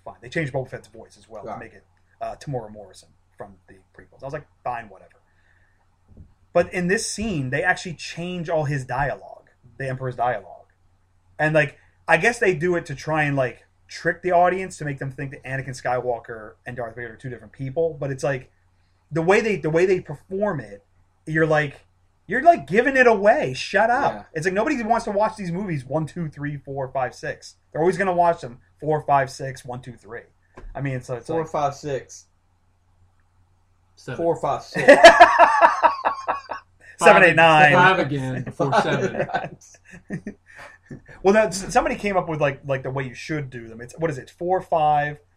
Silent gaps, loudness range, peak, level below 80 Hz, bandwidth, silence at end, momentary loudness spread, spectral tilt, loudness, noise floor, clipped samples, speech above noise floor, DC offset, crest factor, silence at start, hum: none; 15 LU; 0 dBFS; -52 dBFS; 14 kHz; 0.2 s; 20 LU; -5 dB/octave; -20 LUFS; -62 dBFS; under 0.1%; 41 dB; under 0.1%; 22 dB; 0.05 s; none